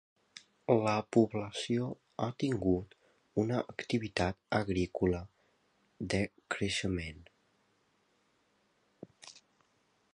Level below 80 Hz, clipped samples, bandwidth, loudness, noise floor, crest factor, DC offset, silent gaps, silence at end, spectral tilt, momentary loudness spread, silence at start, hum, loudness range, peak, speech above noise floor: -56 dBFS; under 0.1%; 11 kHz; -34 LUFS; -74 dBFS; 22 dB; under 0.1%; none; 0.75 s; -6 dB/octave; 23 LU; 0.35 s; none; 8 LU; -12 dBFS; 41 dB